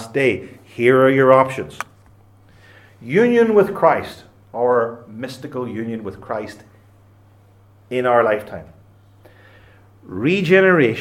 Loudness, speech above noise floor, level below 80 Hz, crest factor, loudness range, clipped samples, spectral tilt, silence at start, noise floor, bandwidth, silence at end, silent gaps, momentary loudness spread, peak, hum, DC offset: -17 LUFS; 33 dB; -60 dBFS; 18 dB; 8 LU; under 0.1%; -7 dB/octave; 0 s; -50 dBFS; 13.5 kHz; 0 s; none; 21 LU; 0 dBFS; none; under 0.1%